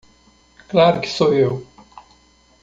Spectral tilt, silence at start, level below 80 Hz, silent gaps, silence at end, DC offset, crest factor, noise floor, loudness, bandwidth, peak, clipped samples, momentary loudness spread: -6 dB/octave; 0.7 s; -54 dBFS; none; 0.6 s; under 0.1%; 18 dB; -54 dBFS; -17 LUFS; 7.8 kHz; -2 dBFS; under 0.1%; 6 LU